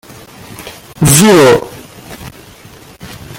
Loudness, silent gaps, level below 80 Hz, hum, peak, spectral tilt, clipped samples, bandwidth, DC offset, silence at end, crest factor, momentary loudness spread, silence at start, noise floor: -7 LUFS; none; -40 dBFS; none; 0 dBFS; -4.5 dB/octave; 0.1%; over 20 kHz; under 0.1%; 0 s; 12 dB; 26 LU; 0.5 s; -36 dBFS